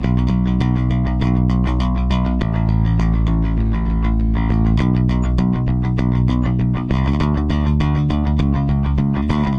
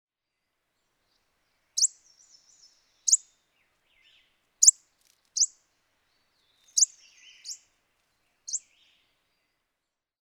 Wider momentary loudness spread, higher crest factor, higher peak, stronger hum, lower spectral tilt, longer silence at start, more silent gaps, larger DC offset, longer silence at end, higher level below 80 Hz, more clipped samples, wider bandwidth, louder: second, 2 LU vs 23 LU; second, 10 dB vs 30 dB; about the same, -6 dBFS vs -4 dBFS; neither; first, -9 dB/octave vs 6.5 dB/octave; second, 0 s vs 1.75 s; neither; neither; second, 0 s vs 1.7 s; first, -20 dBFS vs -86 dBFS; neither; second, 7.2 kHz vs over 20 kHz; first, -18 LUFS vs -24 LUFS